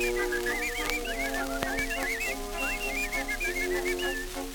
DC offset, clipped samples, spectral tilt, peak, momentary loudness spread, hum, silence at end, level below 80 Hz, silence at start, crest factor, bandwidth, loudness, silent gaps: under 0.1%; under 0.1%; -2.5 dB/octave; -6 dBFS; 2 LU; none; 0 s; -40 dBFS; 0 s; 24 dB; 19.5 kHz; -30 LUFS; none